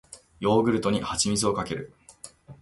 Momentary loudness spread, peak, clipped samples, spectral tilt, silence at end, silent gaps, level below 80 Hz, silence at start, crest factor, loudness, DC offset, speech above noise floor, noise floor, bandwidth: 23 LU; -8 dBFS; under 0.1%; -4.5 dB/octave; 0.05 s; none; -52 dBFS; 0.1 s; 18 dB; -25 LUFS; under 0.1%; 24 dB; -49 dBFS; 11.5 kHz